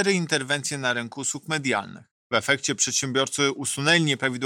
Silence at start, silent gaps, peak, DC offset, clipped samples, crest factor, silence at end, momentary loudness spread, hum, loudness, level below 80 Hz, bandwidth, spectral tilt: 0 s; 2.11-2.30 s; -8 dBFS; under 0.1%; under 0.1%; 18 dB; 0 s; 7 LU; none; -23 LUFS; -68 dBFS; 16.5 kHz; -3 dB/octave